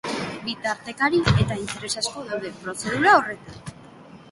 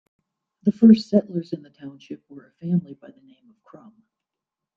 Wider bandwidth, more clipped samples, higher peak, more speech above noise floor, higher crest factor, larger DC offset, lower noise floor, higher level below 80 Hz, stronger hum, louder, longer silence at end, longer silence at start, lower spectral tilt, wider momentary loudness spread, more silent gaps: first, 11.5 kHz vs 7 kHz; neither; about the same, -2 dBFS vs -4 dBFS; second, 22 dB vs 64 dB; about the same, 22 dB vs 20 dB; neither; second, -45 dBFS vs -87 dBFS; first, -44 dBFS vs -66 dBFS; neither; second, -23 LUFS vs -20 LUFS; second, 0 s vs 1.85 s; second, 0.05 s vs 0.65 s; second, -4.5 dB/octave vs -9 dB/octave; second, 17 LU vs 25 LU; neither